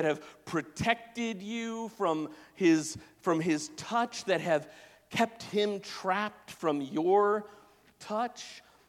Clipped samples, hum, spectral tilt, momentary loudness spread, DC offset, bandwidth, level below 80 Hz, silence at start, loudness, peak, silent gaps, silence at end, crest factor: under 0.1%; none; -4.5 dB/octave; 11 LU; under 0.1%; 15 kHz; -68 dBFS; 0 s; -31 LUFS; -10 dBFS; none; 0.3 s; 22 dB